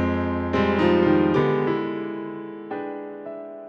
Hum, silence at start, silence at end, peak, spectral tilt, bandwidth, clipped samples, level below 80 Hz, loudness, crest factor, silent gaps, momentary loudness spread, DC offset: none; 0 s; 0 s; -6 dBFS; -8.5 dB/octave; 7 kHz; under 0.1%; -52 dBFS; -23 LUFS; 16 dB; none; 16 LU; under 0.1%